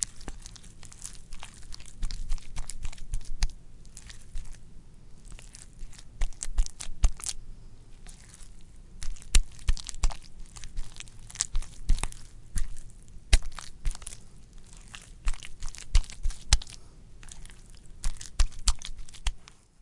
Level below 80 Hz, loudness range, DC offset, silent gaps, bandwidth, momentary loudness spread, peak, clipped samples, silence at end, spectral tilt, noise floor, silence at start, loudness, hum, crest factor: -32 dBFS; 8 LU; under 0.1%; none; 11.5 kHz; 23 LU; -2 dBFS; under 0.1%; 0.4 s; -2 dB/octave; -47 dBFS; 0 s; -35 LUFS; none; 28 dB